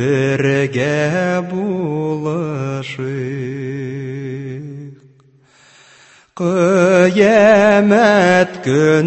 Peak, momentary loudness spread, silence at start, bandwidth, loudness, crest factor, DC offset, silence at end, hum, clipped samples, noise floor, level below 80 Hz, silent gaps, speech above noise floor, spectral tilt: 0 dBFS; 15 LU; 0 s; 8.6 kHz; -15 LUFS; 14 dB; under 0.1%; 0 s; none; under 0.1%; -50 dBFS; -56 dBFS; none; 36 dB; -6.5 dB/octave